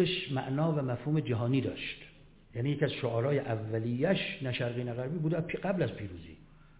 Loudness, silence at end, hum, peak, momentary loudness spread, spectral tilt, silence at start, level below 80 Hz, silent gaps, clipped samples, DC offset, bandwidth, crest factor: -32 LUFS; 0.2 s; none; -14 dBFS; 10 LU; -5.5 dB/octave; 0 s; -58 dBFS; none; under 0.1%; under 0.1%; 4 kHz; 18 dB